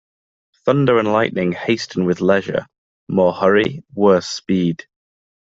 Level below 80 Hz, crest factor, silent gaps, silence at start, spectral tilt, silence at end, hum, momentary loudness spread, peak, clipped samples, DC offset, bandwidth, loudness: -56 dBFS; 16 dB; 2.78-3.07 s; 0.65 s; -6 dB/octave; 0.65 s; none; 8 LU; -2 dBFS; under 0.1%; under 0.1%; 7.8 kHz; -18 LUFS